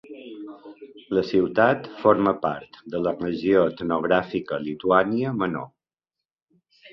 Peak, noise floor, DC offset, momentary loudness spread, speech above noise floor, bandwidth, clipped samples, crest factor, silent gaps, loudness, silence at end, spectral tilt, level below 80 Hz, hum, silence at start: -4 dBFS; -88 dBFS; under 0.1%; 19 LU; 65 dB; 6.2 kHz; under 0.1%; 20 dB; 6.25-6.29 s, 6.42-6.47 s; -23 LUFS; 0.05 s; -8.5 dB/octave; -58 dBFS; none; 0.05 s